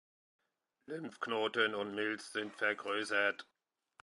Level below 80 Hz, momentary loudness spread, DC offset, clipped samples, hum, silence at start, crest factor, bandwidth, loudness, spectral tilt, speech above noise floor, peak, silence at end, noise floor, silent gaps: -86 dBFS; 13 LU; under 0.1%; under 0.1%; none; 0.9 s; 22 dB; 11 kHz; -36 LUFS; -3 dB/octave; 32 dB; -18 dBFS; 0.6 s; -69 dBFS; none